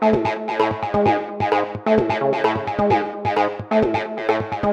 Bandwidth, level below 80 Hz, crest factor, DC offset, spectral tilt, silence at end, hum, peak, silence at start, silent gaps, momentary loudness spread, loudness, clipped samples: 8.4 kHz; -48 dBFS; 16 dB; under 0.1%; -7 dB/octave; 0 s; none; -4 dBFS; 0 s; none; 4 LU; -20 LUFS; under 0.1%